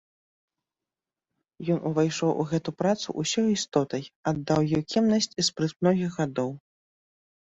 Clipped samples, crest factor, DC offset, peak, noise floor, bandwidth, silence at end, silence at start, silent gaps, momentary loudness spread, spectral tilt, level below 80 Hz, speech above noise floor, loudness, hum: under 0.1%; 18 dB; under 0.1%; -10 dBFS; under -90 dBFS; 8.2 kHz; 0.85 s; 1.6 s; 4.16-4.23 s; 7 LU; -5 dB/octave; -62 dBFS; over 64 dB; -26 LUFS; none